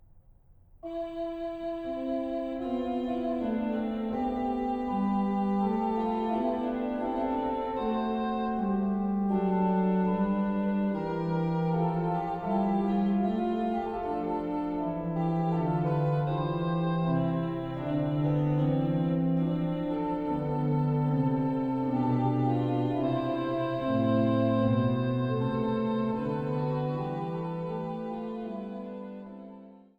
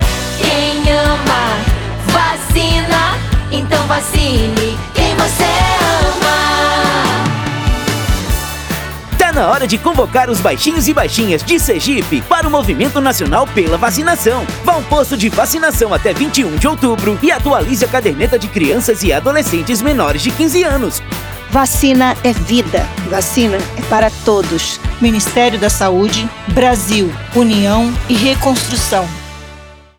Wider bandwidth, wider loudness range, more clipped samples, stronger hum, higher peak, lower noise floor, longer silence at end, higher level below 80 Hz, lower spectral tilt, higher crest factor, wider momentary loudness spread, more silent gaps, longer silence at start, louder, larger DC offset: second, 5.2 kHz vs over 20 kHz; first, 4 LU vs 1 LU; neither; neither; second, -14 dBFS vs 0 dBFS; first, -57 dBFS vs -35 dBFS; about the same, 0.2 s vs 0.25 s; second, -54 dBFS vs -24 dBFS; first, -10 dB/octave vs -4 dB/octave; about the same, 14 dB vs 12 dB; first, 8 LU vs 5 LU; neither; first, 0.15 s vs 0 s; second, -29 LUFS vs -13 LUFS; neither